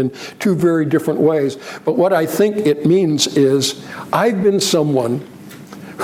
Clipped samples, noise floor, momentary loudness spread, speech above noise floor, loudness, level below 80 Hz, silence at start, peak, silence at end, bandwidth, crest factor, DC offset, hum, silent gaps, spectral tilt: under 0.1%; -35 dBFS; 13 LU; 20 dB; -16 LUFS; -60 dBFS; 0 s; -2 dBFS; 0 s; 16.5 kHz; 14 dB; under 0.1%; none; none; -5 dB/octave